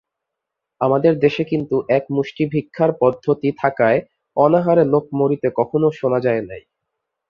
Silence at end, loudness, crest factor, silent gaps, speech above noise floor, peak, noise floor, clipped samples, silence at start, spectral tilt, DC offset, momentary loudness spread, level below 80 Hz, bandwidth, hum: 0.7 s; -18 LUFS; 16 dB; none; 64 dB; -2 dBFS; -81 dBFS; under 0.1%; 0.8 s; -9 dB/octave; under 0.1%; 7 LU; -58 dBFS; 6.8 kHz; none